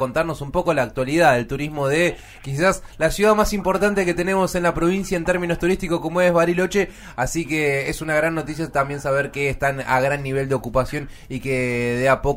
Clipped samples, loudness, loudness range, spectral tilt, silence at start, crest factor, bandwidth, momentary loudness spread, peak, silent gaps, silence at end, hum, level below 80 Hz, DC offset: under 0.1%; -21 LUFS; 3 LU; -5.5 dB/octave; 0 s; 16 dB; 16 kHz; 7 LU; -4 dBFS; none; 0 s; none; -38 dBFS; under 0.1%